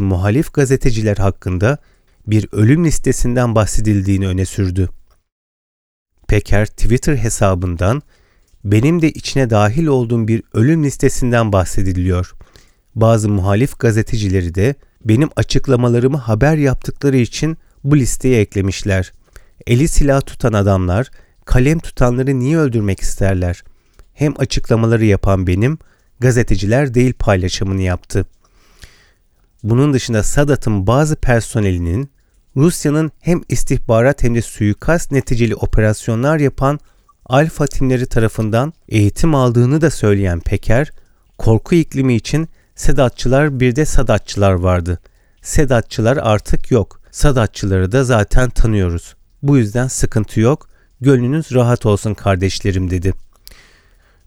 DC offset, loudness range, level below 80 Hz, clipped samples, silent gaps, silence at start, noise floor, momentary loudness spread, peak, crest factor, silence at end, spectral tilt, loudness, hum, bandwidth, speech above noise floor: under 0.1%; 2 LU; -24 dBFS; under 0.1%; 5.32-6.06 s; 0 s; -54 dBFS; 6 LU; 0 dBFS; 14 dB; 1.05 s; -6.5 dB/octave; -15 LUFS; none; 16 kHz; 41 dB